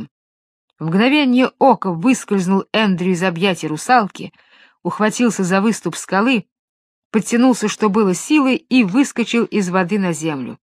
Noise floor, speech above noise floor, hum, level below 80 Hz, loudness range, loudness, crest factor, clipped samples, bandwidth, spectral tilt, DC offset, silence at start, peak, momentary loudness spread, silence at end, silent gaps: under -90 dBFS; over 74 dB; none; -66 dBFS; 2 LU; -16 LUFS; 16 dB; under 0.1%; 14 kHz; -5 dB/octave; under 0.1%; 0 s; 0 dBFS; 8 LU; 0.05 s; 0.11-0.68 s, 6.52-7.11 s